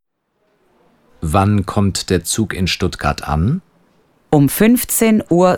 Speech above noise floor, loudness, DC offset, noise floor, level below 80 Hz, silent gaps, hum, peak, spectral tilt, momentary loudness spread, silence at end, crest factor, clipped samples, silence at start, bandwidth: 51 dB; -16 LUFS; under 0.1%; -66 dBFS; -34 dBFS; none; none; 0 dBFS; -5 dB/octave; 7 LU; 0 s; 16 dB; under 0.1%; 1.2 s; 19.5 kHz